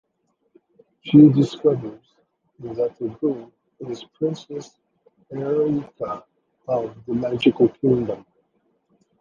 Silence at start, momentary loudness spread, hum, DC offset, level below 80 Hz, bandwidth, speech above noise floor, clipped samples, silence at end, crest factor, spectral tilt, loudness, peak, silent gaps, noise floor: 1.05 s; 21 LU; none; under 0.1%; -60 dBFS; 7.2 kHz; 50 dB; under 0.1%; 1 s; 20 dB; -8.5 dB/octave; -21 LUFS; -2 dBFS; none; -71 dBFS